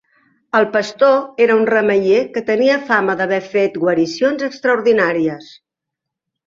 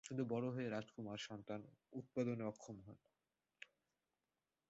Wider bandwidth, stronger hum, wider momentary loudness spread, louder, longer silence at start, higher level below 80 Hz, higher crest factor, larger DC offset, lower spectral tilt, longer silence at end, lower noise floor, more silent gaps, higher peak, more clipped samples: about the same, 7.6 kHz vs 7.6 kHz; neither; second, 5 LU vs 19 LU; first, -15 LUFS vs -47 LUFS; first, 0.55 s vs 0.05 s; first, -62 dBFS vs -82 dBFS; second, 14 dB vs 20 dB; neither; about the same, -5.5 dB/octave vs -6 dB/octave; about the same, 1.05 s vs 1.05 s; second, -82 dBFS vs under -90 dBFS; neither; first, -2 dBFS vs -28 dBFS; neither